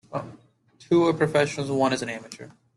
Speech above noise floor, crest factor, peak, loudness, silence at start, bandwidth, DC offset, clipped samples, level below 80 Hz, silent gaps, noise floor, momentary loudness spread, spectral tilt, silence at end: 32 dB; 18 dB; -8 dBFS; -24 LUFS; 0.1 s; 11.5 kHz; under 0.1%; under 0.1%; -62 dBFS; none; -56 dBFS; 20 LU; -5.5 dB/octave; 0.3 s